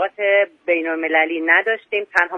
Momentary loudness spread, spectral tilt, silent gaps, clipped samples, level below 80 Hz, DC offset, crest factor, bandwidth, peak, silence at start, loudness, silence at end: 5 LU; -3.5 dB/octave; none; under 0.1%; -68 dBFS; under 0.1%; 18 dB; 9 kHz; 0 dBFS; 0 s; -18 LUFS; 0 s